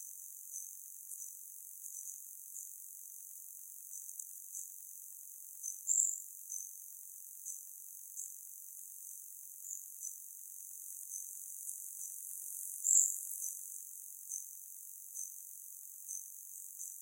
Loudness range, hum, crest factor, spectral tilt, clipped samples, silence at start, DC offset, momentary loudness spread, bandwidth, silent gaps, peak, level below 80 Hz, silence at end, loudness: 11 LU; none; 32 dB; 6 dB/octave; under 0.1%; 0 s; under 0.1%; 14 LU; 16.5 kHz; none; -12 dBFS; under -90 dBFS; 0 s; -41 LUFS